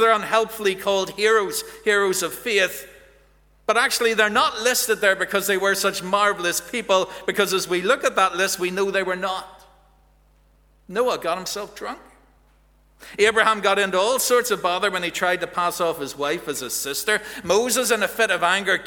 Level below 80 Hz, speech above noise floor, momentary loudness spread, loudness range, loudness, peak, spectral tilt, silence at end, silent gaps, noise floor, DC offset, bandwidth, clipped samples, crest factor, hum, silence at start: -58 dBFS; 36 dB; 8 LU; 6 LU; -21 LUFS; -2 dBFS; -2 dB/octave; 0 s; none; -57 dBFS; under 0.1%; over 20 kHz; under 0.1%; 20 dB; none; 0 s